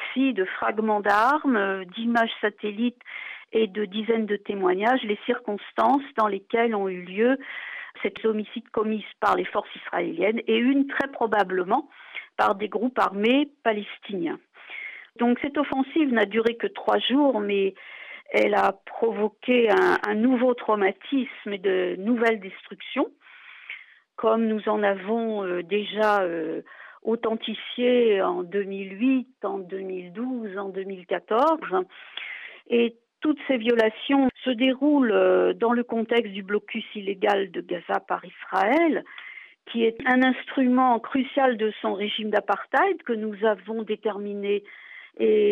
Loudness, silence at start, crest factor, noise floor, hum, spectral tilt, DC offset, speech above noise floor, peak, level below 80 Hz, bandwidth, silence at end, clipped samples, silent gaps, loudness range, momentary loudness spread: -24 LUFS; 0 s; 14 dB; -46 dBFS; none; -6.5 dB/octave; under 0.1%; 22 dB; -10 dBFS; -70 dBFS; 8.2 kHz; 0 s; under 0.1%; none; 4 LU; 12 LU